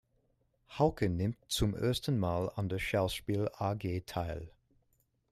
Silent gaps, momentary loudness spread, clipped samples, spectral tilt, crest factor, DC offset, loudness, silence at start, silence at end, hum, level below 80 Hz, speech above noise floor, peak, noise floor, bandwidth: none; 7 LU; under 0.1%; -6 dB/octave; 20 dB; under 0.1%; -34 LUFS; 0.7 s; 0.8 s; none; -52 dBFS; 42 dB; -16 dBFS; -75 dBFS; 15.5 kHz